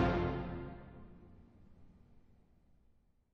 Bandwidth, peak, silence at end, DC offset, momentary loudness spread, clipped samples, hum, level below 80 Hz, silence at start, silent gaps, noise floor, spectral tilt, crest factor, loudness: 7 kHz; -20 dBFS; 1.15 s; under 0.1%; 26 LU; under 0.1%; none; -52 dBFS; 0 s; none; -70 dBFS; -6.5 dB/octave; 22 dB; -40 LUFS